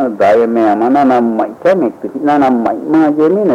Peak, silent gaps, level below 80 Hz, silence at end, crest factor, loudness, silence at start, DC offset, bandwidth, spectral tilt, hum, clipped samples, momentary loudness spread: -2 dBFS; none; -56 dBFS; 0 s; 8 dB; -11 LUFS; 0 s; under 0.1%; 9 kHz; -7.5 dB/octave; none; under 0.1%; 5 LU